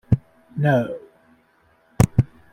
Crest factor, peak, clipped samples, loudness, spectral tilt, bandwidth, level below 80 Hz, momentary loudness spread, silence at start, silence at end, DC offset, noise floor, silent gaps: 22 dB; -2 dBFS; under 0.1%; -21 LUFS; -7.5 dB/octave; 16.5 kHz; -40 dBFS; 15 LU; 0.1 s; 0.25 s; under 0.1%; -60 dBFS; none